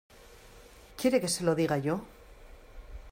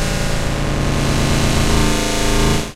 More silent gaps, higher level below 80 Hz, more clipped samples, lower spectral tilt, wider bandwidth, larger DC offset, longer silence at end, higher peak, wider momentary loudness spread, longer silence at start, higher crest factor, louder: neither; second, -52 dBFS vs -20 dBFS; neither; about the same, -5 dB/octave vs -4.5 dB/octave; about the same, 16 kHz vs 16 kHz; neither; about the same, 0 s vs 0 s; second, -14 dBFS vs -4 dBFS; first, 23 LU vs 4 LU; first, 0.2 s vs 0 s; first, 18 dB vs 12 dB; second, -29 LUFS vs -17 LUFS